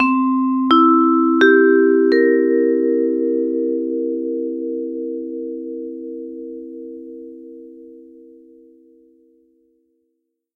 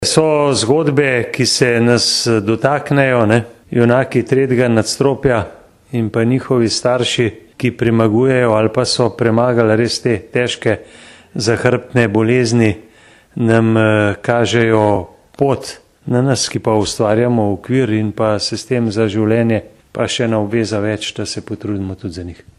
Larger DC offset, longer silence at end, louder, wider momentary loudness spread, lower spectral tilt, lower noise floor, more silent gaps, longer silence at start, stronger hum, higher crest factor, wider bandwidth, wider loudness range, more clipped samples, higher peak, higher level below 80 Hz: neither; first, 2.55 s vs 0.25 s; about the same, -16 LUFS vs -15 LUFS; first, 21 LU vs 9 LU; about the same, -5.5 dB/octave vs -5 dB/octave; first, -73 dBFS vs -43 dBFS; neither; about the same, 0 s vs 0 s; neither; about the same, 18 dB vs 14 dB; second, 6 kHz vs 12.5 kHz; first, 22 LU vs 3 LU; neither; about the same, 0 dBFS vs 0 dBFS; second, -64 dBFS vs -46 dBFS